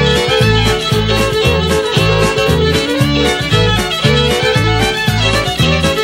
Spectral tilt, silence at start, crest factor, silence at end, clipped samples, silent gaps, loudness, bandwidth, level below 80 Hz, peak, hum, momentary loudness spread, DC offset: -4.5 dB/octave; 0 s; 12 dB; 0 s; under 0.1%; none; -12 LUFS; 16 kHz; -24 dBFS; 0 dBFS; none; 2 LU; under 0.1%